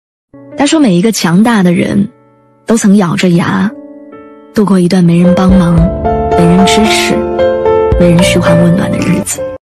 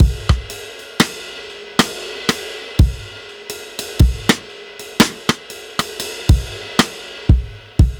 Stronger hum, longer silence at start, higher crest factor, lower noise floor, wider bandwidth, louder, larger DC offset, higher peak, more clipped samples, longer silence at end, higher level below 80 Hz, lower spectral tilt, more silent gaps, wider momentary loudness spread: neither; first, 0.35 s vs 0 s; second, 8 dB vs 18 dB; first, -45 dBFS vs -34 dBFS; second, 13.5 kHz vs over 20 kHz; first, -9 LUFS vs -19 LUFS; neither; about the same, 0 dBFS vs 0 dBFS; neither; first, 0.2 s vs 0 s; about the same, -26 dBFS vs -22 dBFS; first, -6 dB/octave vs -4.5 dB/octave; neither; second, 7 LU vs 15 LU